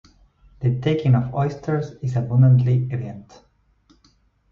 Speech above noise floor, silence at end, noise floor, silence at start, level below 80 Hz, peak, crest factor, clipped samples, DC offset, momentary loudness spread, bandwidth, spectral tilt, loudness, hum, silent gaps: 41 dB; 1.3 s; -60 dBFS; 0.6 s; -52 dBFS; -6 dBFS; 16 dB; under 0.1%; under 0.1%; 13 LU; 6.6 kHz; -9.5 dB/octave; -20 LUFS; none; none